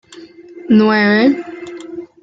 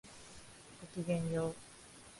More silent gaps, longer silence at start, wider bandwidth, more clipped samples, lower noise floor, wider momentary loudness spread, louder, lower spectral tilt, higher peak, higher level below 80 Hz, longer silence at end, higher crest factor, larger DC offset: neither; about the same, 0.15 s vs 0.05 s; second, 7.8 kHz vs 11.5 kHz; neither; second, -38 dBFS vs -57 dBFS; about the same, 20 LU vs 19 LU; first, -12 LUFS vs -39 LUFS; about the same, -7 dB/octave vs -6 dB/octave; first, -2 dBFS vs -22 dBFS; first, -60 dBFS vs -66 dBFS; first, 0.2 s vs 0 s; about the same, 14 dB vs 18 dB; neither